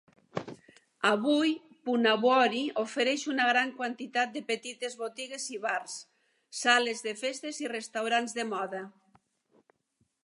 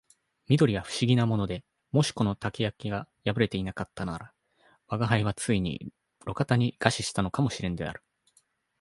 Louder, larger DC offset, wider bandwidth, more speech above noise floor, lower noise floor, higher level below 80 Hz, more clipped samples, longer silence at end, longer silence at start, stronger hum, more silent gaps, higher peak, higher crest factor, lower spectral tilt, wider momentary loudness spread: about the same, -29 LUFS vs -28 LUFS; neither; about the same, 11.5 kHz vs 11.5 kHz; first, 46 dB vs 41 dB; first, -76 dBFS vs -69 dBFS; second, -82 dBFS vs -52 dBFS; neither; first, 1.35 s vs 0.85 s; second, 0.35 s vs 0.5 s; neither; neither; second, -8 dBFS vs -2 dBFS; about the same, 24 dB vs 26 dB; second, -2.5 dB/octave vs -5.5 dB/octave; about the same, 15 LU vs 13 LU